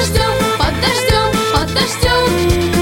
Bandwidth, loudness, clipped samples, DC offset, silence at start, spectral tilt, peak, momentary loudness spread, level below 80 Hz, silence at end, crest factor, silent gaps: 17 kHz; -14 LUFS; under 0.1%; under 0.1%; 0 s; -4 dB/octave; -2 dBFS; 2 LU; -24 dBFS; 0 s; 12 dB; none